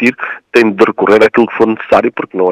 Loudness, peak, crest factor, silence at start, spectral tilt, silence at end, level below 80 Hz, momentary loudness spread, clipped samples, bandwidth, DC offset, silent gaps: -10 LUFS; 0 dBFS; 10 dB; 0 s; -6 dB/octave; 0 s; -50 dBFS; 7 LU; 1%; 12 kHz; under 0.1%; none